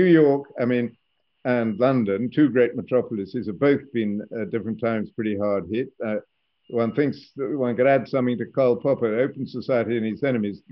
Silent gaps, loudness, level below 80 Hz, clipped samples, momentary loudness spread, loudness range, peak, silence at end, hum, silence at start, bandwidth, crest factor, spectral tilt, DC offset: none; -23 LUFS; -68 dBFS; under 0.1%; 10 LU; 4 LU; -6 dBFS; 0.15 s; none; 0 s; 5.8 kHz; 16 dB; -6.5 dB/octave; under 0.1%